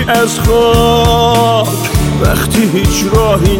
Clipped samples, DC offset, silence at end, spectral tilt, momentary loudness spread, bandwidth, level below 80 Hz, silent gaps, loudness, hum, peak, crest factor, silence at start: under 0.1%; under 0.1%; 0 s; -5 dB/octave; 4 LU; 17 kHz; -20 dBFS; none; -10 LUFS; none; 0 dBFS; 10 dB; 0 s